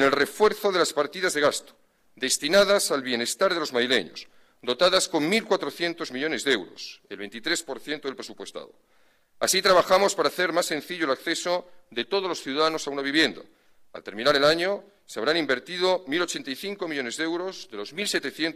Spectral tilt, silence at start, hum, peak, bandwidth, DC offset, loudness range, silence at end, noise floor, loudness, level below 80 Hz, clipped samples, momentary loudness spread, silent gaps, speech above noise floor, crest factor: -2.5 dB/octave; 0 s; none; -8 dBFS; 15.5 kHz; under 0.1%; 4 LU; 0.05 s; -59 dBFS; -24 LUFS; -64 dBFS; under 0.1%; 16 LU; none; 34 dB; 18 dB